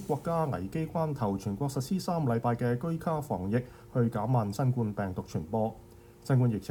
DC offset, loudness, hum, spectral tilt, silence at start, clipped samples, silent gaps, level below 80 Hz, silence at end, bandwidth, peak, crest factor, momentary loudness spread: under 0.1%; -31 LUFS; none; -8 dB/octave; 0 s; under 0.1%; none; -56 dBFS; 0 s; 18 kHz; -16 dBFS; 14 dB; 6 LU